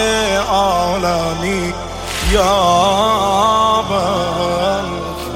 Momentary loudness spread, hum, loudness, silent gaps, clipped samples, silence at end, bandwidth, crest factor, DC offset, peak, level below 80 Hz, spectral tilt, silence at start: 8 LU; none; -15 LUFS; none; under 0.1%; 0 s; 16.5 kHz; 14 dB; under 0.1%; -2 dBFS; -30 dBFS; -4 dB/octave; 0 s